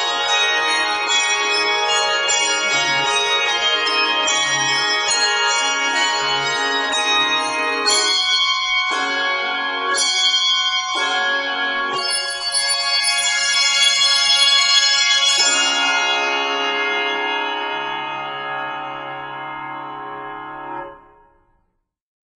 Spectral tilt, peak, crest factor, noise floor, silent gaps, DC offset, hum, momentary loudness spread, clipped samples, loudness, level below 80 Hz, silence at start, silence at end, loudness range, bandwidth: 1 dB/octave; -2 dBFS; 18 dB; -69 dBFS; none; under 0.1%; none; 14 LU; under 0.1%; -16 LUFS; -62 dBFS; 0 s; 1.4 s; 13 LU; 13 kHz